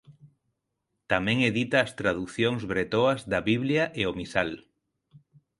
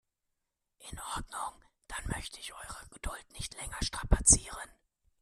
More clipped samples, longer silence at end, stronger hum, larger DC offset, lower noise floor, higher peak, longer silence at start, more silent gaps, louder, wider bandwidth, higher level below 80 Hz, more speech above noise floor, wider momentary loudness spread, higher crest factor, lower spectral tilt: neither; second, 0.4 s vs 0.55 s; neither; neither; second, -81 dBFS vs -85 dBFS; about the same, -6 dBFS vs -8 dBFS; second, 0.1 s vs 0.8 s; neither; first, -26 LUFS vs -31 LUFS; second, 11.5 kHz vs 14 kHz; second, -56 dBFS vs -40 dBFS; first, 55 dB vs 51 dB; second, 5 LU vs 22 LU; second, 22 dB vs 28 dB; first, -5.5 dB/octave vs -2.5 dB/octave